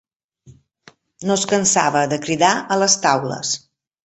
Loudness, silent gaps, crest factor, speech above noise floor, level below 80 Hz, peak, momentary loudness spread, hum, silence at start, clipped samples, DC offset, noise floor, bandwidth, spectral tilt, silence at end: -18 LUFS; none; 18 dB; 34 dB; -60 dBFS; -2 dBFS; 8 LU; none; 0.45 s; under 0.1%; under 0.1%; -51 dBFS; 8.4 kHz; -2.5 dB/octave; 0.45 s